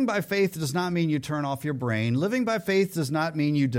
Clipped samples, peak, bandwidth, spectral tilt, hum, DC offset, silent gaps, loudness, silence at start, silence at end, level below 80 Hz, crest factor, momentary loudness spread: under 0.1%; -12 dBFS; 16.5 kHz; -6 dB/octave; none; under 0.1%; none; -26 LUFS; 0 s; 0 s; -64 dBFS; 12 dB; 4 LU